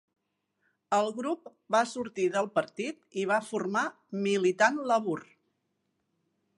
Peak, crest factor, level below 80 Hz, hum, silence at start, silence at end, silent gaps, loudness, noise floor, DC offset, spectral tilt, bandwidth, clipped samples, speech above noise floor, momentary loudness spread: -10 dBFS; 22 dB; -82 dBFS; none; 0.9 s; 1.35 s; none; -30 LUFS; -79 dBFS; under 0.1%; -4.5 dB/octave; 11.5 kHz; under 0.1%; 50 dB; 10 LU